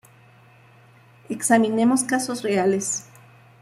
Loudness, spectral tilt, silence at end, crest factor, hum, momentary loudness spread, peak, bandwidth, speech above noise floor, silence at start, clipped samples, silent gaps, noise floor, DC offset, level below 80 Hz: -21 LUFS; -4 dB/octave; 0.6 s; 18 dB; none; 9 LU; -6 dBFS; 14.5 kHz; 31 dB; 1.3 s; under 0.1%; none; -52 dBFS; under 0.1%; -68 dBFS